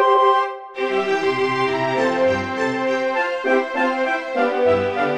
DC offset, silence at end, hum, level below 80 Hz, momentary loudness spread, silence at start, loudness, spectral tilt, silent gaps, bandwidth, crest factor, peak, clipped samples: under 0.1%; 0 s; none; -60 dBFS; 4 LU; 0 s; -19 LUFS; -5 dB/octave; none; 10 kHz; 14 dB; -4 dBFS; under 0.1%